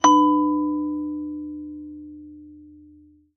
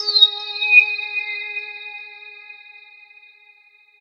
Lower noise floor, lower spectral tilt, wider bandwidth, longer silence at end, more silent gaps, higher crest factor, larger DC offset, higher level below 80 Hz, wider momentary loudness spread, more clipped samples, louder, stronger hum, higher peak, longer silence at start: about the same, -52 dBFS vs -53 dBFS; first, -3.5 dB/octave vs 4 dB/octave; second, 6.6 kHz vs 7.6 kHz; second, 0.7 s vs 1.45 s; neither; about the same, 20 dB vs 22 dB; neither; first, -60 dBFS vs under -90 dBFS; about the same, 25 LU vs 26 LU; neither; second, -22 LUFS vs -15 LUFS; neither; second, -4 dBFS vs 0 dBFS; about the same, 0.05 s vs 0 s